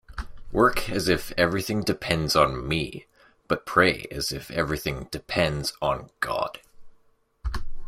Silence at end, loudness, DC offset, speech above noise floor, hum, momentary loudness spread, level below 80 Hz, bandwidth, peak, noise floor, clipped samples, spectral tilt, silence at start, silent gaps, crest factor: 0 s; -25 LUFS; under 0.1%; 36 dB; none; 14 LU; -40 dBFS; 16 kHz; -2 dBFS; -62 dBFS; under 0.1%; -4.5 dB/octave; 0.1 s; none; 24 dB